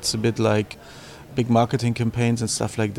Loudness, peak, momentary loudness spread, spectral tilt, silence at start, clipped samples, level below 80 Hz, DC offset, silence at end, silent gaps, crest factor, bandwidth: -22 LUFS; -6 dBFS; 16 LU; -5.5 dB/octave; 0 s; under 0.1%; -50 dBFS; under 0.1%; 0 s; none; 16 dB; 15 kHz